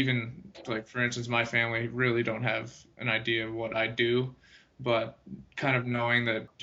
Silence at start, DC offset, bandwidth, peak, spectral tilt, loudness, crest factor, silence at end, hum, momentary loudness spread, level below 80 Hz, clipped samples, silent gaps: 0 s; under 0.1%; 8 kHz; -10 dBFS; -3.5 dB/octave; -29 LUFS; 20 dB; 0 s; none; 12 LU; -64 dBFS; under 0.1%; none